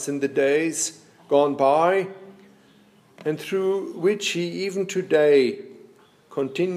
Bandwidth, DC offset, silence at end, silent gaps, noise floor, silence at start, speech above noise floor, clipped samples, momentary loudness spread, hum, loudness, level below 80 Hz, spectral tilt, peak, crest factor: 15.5 kHz; under 0.1%; 0 s; none; -55 dBFS; 0 s; 33 dB; under 0.1%; 11 LU; none; -22 LUFS; -78 dBFS; -4 dB/octave; -6 dBFS; 18 dB